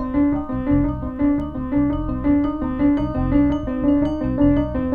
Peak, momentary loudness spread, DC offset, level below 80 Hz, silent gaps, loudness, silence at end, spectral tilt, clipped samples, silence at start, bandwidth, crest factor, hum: -6 dBFS; 5 LU; under 0.1%; -30 dBFS; none; -20 LUFS; 0 s; -10.5 dB/octave; under 0.1%; 0 s; 3.4 kHz; 14 dB; none